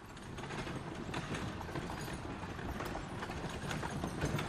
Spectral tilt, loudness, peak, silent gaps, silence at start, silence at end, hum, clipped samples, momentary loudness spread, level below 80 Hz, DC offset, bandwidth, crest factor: -5 dB/octave; -42 LUFS; -22 dBFS; none; 0 s; 0 s; none; under 0.1%; 4 LU; -52 dBFS; under 0.1%; 15 kHz; 18 dB